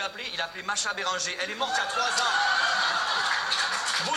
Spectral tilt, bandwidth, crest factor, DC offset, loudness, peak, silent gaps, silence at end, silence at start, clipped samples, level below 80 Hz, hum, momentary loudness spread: 0.5 dB/octave; 16 kHz; 16 dB; under 0.1%; -26 LUFS; -12 dBFS; none; 0 s; 0 s; under 0.1%; -68 dBFS; none; 7 LU